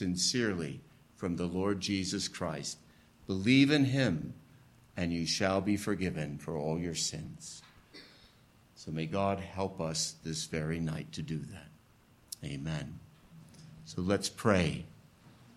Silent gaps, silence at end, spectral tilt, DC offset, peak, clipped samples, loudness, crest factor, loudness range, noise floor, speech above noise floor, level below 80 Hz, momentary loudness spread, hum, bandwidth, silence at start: none; 0.25 s; -4.5 dB/octave; under 0.1%; -12 dBFS; under 0.1%; -33 LUFS; 24 dB; 9 LU; -63 dBFS; 30 dB; -60 dBFS; 20 LU; none; 13.5 kHz; 0 s